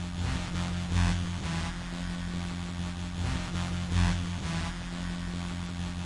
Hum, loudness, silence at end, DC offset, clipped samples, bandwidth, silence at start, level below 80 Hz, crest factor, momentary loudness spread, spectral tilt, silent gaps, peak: none; -33 LUFS; 0 s; under 0.1%; under 0.1%; 11.5 kHz; 0 s; -40 dBFS; 18 dB; 7 LU; -5.5 dB/octave; none; -14 dBFS